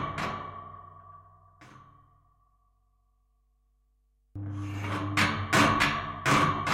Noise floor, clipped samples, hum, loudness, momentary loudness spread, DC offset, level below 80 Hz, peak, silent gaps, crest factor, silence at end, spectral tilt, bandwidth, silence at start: -69 dBFS; under 0.1%; none; -27 LUFS; 21 LU; under 0.1%; -54 dBFS; -10 dBFS; none; 22 dB; 0 s; -4.5 dB/octave; 16 kHz; 0 s